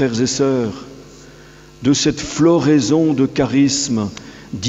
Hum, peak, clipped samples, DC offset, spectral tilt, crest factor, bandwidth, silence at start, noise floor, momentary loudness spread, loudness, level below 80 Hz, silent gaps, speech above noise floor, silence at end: none; -2 dBFS; under 0.1%; under 0.1%; -5 dB/octave; 14 dB; 8.2 kHz; 0 s; -41 dBFS; 15 LU; -16 LUFS; -46 dBFS; none; 26 dB; 0 s